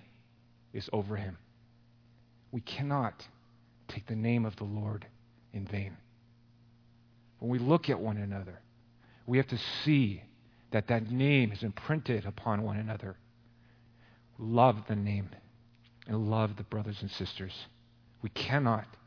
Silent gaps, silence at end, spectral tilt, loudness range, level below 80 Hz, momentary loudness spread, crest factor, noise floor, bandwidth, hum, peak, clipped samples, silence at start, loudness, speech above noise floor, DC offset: none; 0.1 s; -8 dB/octave; 8 LU; -66 dBFS; 17 LU; 26 dB; -63 dBFS; 5.4 kHz; none; -8 dBFS; under 0.1%; 0.75 s; -33 LUFS; 31 dB; under 0.1%